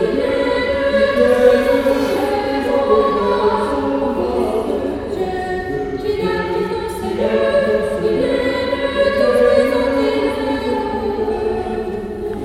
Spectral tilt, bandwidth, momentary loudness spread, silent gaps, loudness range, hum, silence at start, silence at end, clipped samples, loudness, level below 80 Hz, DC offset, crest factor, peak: -6 dB/octave; 14.5 kHz; 9 LU; none; 5 LU; none; 0 s; 0 s; under 0.1%; -17 LUFS; -38 dBFS; under 0.1%; 16 dB; 0 dBFS